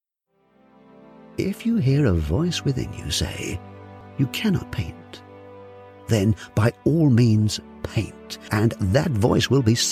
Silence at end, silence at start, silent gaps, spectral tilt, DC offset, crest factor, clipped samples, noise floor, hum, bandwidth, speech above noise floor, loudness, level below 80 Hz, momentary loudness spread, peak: 0 s; 1.35 s; none; -5.5 dB/octave; under 0.1%; 18 dB; under 0.1%; -67 dBFS; none; 15.5 kHz; 46 dB; -22 LUFS; -42 dBFS; 21 LU; -4 dBFS